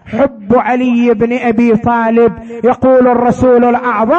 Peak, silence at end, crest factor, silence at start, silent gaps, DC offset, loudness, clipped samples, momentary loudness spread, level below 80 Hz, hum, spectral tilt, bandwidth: 0 dBFS; 0 s; 10 dB; 0.05 s; none; under 0.1%; -10 LUFS; under 0.1%; 5 LU; -40 dBFS; none; -8 dB/octave; 8 kHz